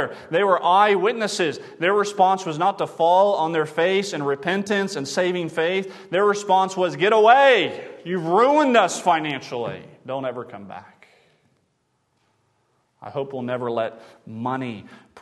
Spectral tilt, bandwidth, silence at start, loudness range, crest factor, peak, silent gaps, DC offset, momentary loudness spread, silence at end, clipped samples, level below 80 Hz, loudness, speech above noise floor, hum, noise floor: -4.5 dB/octave; 12.5 kHz; 0 s; 16 LU; 20 dB; -2 dBFS; none; under 0.1%; 15 LU; 0 s; under 0.1%; -74 dBFS; -20 LUFS; 49 dB; none; -70 dBFS